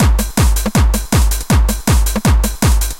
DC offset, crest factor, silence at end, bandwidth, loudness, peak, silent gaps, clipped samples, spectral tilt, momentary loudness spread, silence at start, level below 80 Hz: under 0.1%; 12 dB; 0 s; 17 kHz; -14 LUFS; 0 dBFS; none; under 0.1%; -5 dB/octave; 1 LU; 0 s; -14 dBFS